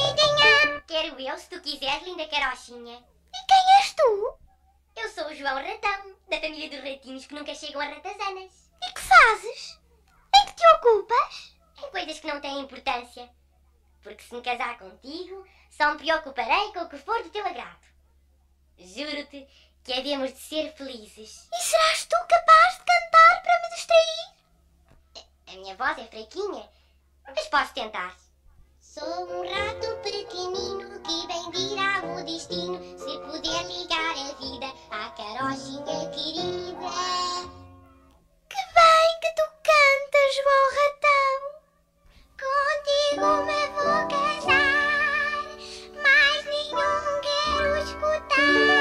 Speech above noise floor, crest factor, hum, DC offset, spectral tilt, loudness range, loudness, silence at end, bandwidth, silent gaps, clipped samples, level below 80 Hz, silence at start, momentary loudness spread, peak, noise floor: 37 dB; 22 dB; none; under 0.1%; -2 dB/octave; 14 LU; -23 LUFS; 0 s; 15.5 kHz; none; under 0.1%; -54 dBFS; 0 s; 20 LU; -4 dBFS; -62 dBFS